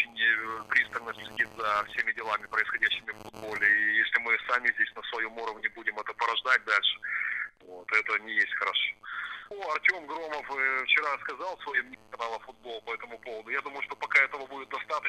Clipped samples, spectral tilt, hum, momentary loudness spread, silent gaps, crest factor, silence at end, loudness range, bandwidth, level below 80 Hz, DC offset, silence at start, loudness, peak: under 0.1%; -1.5 dB/octave; none; 14 LU; none; 22 dB; 0 s; 4 LU; 14.5 kHz; -68 dBFS; under 0.1%; 0 s; -28 LUFS; -8 dBFS